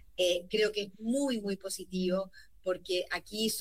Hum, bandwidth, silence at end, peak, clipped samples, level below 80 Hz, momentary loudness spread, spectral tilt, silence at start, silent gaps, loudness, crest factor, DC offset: none; 16 kHz; 0 s; -18 dBFS; under 0.1%; -64 dBFS; 7 LU; -3.5 dB/octave; 0.2 s; none; -33 LUFS; 14 dB; 0.1%